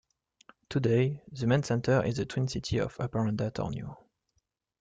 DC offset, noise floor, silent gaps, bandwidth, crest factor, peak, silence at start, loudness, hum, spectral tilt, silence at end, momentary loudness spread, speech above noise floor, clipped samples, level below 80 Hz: under 0.1%; -78 dBFS; none; 9 kHz; 18 dB; -12 dBFS; 0.7 s; -30 LUFS; none; -6.5 dB/octave; 0.85 s; 8 LU; 49 dB; under 0.1%; -56 dBFS